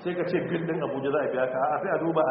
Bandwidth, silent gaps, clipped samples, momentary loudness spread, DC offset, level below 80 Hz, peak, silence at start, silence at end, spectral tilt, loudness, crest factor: 4.3 kHz; none; under 0.1%; 3 LU; under 0.1%; -66 dBFS; -12 dBFS; 0 s; 0 s; -5.5 dB/octave; -27 LUFS; 14 dB